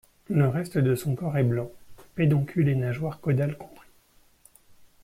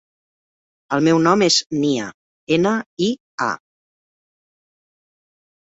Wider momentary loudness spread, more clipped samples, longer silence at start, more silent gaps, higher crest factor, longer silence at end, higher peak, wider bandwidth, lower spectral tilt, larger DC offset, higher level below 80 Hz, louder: about the same, 12 LU vs 10 LU; neither; second, 0.3 s vs 0.9 s; second, none vs 1.66-1.70 s, 2.14-2.47 s, 2.86-2.97 s, 3.20-3.38 s; about the same, 16 dB vs 20 dB; second, 1.3 s vs 2.1 s; second, -10 dBFS vs -2 dBFS; first, 15 kHz vs 8 kHz; first, -8.5 dB/octave vs -4 dB/octave; neither; about the same, -58 dBFS vs -62 dBFS; second, -26 LUFS vs -18 LUFS